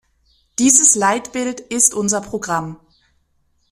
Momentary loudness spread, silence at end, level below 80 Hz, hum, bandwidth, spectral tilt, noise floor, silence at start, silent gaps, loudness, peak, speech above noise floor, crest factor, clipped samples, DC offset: 14 LU; 0.95 s; -56 dBFS; none; 15.5 kHz; -2.5 dB/octave; -63 dBFS; 0.6 s; none; -15 LUFS; 0 dBFS; 46 dB; 20 dB; under 0.1%; under 0.1%